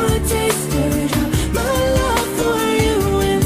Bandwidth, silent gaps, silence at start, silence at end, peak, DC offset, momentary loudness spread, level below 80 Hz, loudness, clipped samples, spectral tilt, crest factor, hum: 16 kHz; none; 0 s; 0 s; -4 dBFS; under 0.1%; 2 LU; -26 dBFS; -17 LUFS; under 0.1%; -5 dB/octave; 12 dB; none